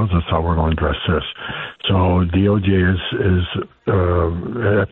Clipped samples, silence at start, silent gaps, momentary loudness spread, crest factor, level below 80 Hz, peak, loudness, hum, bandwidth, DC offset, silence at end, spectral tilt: under 0.1%; 0 s; none; 8 LU; 12 dB; -30 dBFS; -6 dBFS; -18 LUFS; none; 4 kHz; under 0.1%; 0.05 s; -10.5 dB/octave